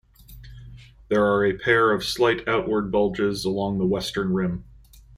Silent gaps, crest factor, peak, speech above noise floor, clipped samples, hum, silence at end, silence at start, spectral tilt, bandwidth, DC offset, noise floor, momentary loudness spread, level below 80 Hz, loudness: none; 20 dB; -4 dBFS; 23 dB; under 0.1%; none; 0.55 s; 0.3 s; -5.5 dB/octave; 15.5 kHz; under 0.1%; -45 dBFS; 6 LU; -48 dBFS; -23 LUFS